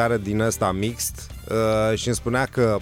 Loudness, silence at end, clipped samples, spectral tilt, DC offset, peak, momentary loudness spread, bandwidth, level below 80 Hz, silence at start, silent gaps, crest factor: -23 LUFS; 0 s; under 0.1%; -5 dB/octave; under 0.1%; -8 dBFS; 7 LU; 16.5 kHz; -42 dBFS; 0 s; none; 14 dB